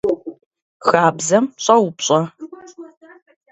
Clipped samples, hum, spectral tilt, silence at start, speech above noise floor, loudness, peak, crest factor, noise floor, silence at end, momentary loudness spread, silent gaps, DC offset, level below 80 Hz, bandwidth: under 0.1%; none; -4 dB/octave; 0.05 s; 22 dB; -17 LUFS; 0 dBFS; 18 dB; -38 dBFS; 0.7 s; 21 LU; 0.46-0.51 s, 0.62-0.80 s; under 0.1%; -60 dBFS; 8.2 kHz